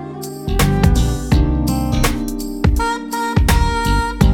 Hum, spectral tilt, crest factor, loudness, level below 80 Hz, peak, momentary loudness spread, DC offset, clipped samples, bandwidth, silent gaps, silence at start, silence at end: none; -5.5 dB/octave; 16 dB; -17 LUFS; -20 dBFS; 0 dBFS; 7 LU; under 0.1%; under 0.1%; 19 kHz; none; 0 s; 0 s